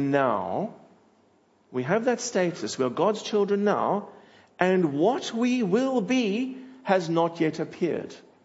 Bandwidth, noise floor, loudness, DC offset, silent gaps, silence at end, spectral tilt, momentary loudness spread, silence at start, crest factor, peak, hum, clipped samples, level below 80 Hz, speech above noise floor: 8 kHz; -63 dBFS; -26 LUFS; under 0.1%; none; 0.25 s; -5.5 dB/octave; 9 LU; 0 s; 20 dB; -6 dBFS; none; under 0.1%; -76 dBFS; 38 dB